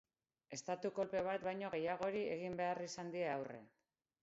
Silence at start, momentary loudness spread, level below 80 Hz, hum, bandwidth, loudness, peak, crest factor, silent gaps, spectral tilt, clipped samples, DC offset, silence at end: 0.5 s; 8 LU; -80 dBFS; none; 7.6 kHz; -43 LUFS; -28 dBFS; 16 dB; none; -4 dB/octave; under 0.1%; under 0.1%; 0.55 s